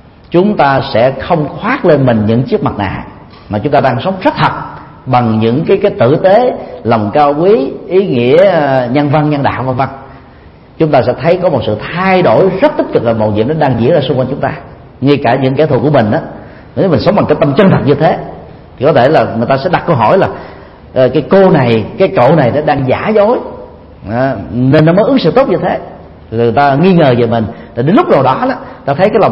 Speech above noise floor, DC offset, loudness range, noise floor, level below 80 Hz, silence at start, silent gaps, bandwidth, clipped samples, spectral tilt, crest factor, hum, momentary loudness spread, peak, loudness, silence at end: 27 dB; under 0.1%; 2 LU; -36 dBFS; -40 dBFS; 0.3 s; none; 5.8 kHz; 0.3%; -9.5 dB/octave; 10 dB; none; 11 LU; 0 dBFS; -10 LUFS; 0 s